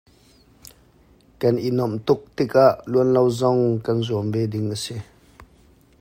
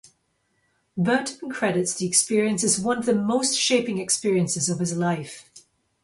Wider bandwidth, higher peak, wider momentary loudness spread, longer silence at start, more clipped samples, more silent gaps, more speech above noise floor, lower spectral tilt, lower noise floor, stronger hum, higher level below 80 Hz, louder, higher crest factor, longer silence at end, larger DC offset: first, 16 kHz vs 11.5 kHz; first, -2 dBFS vs -6 dBFS; about the same, 9 LU vs 8 LU; first, 1.4 s vs 0.95 s; neither; neither; second, 35 dB vs 47 dB; first, -7 dB/octave vs -3.5 dB/octave; second, -54 dBFS vs -70 dBFS; neither; first, -56 dBFS vs -64 dBFS; about the same, -21 LUFS vs -23 LUFS; about the same, 20 dB vs 20 dB; about the same, 0.55 s vs 0.45 s; neither